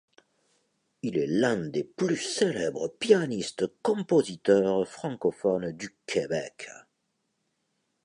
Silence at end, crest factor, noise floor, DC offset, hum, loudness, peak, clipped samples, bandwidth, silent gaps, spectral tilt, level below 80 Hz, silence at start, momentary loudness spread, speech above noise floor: 1.25 s; 20 dB; -78 dBFS; under 0.1%; none; -28 LUFS; -8 dBFS; under 0.1%; 11 kHz; none; -5 dB/octave; -68 dBFS; 1.05 s; 10 LU; 50 dB